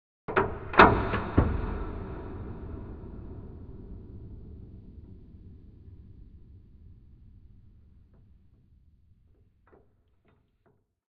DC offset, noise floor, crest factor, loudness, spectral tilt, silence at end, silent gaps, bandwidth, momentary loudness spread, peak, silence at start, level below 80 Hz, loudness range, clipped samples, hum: under 0.1%; -69 dBFS; 30 dB; -26 LUFS; -4.5 dB/octave; 3.8 s; none; 6.6 kHz; 31 LU; -2 dBFS; 0.3 s; -42 dBFS; 27 LU; under 0.1%; none